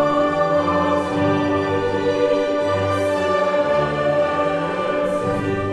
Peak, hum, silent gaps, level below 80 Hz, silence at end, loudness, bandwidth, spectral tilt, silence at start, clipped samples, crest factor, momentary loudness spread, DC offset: -6 dBFS; none; none; -48 dBFS; 0 s; -19 LUFS; 11.5 kHz; -6.5 dB/octave; 0 s; under 0.1%; 12 dB; 3 LU; under 0.1%